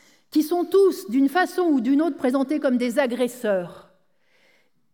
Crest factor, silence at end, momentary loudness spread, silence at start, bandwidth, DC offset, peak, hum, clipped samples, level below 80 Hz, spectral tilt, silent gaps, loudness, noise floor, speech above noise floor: 14 dB; 1.15 s; 6 LU; 0.35 s; 19.5 kHz; under 0.1%; -10 dBFS; none; under 0.1%; -78 dBFS; -5 dB/octave; none; -22 LUFS; -65 dBFS; 44 dB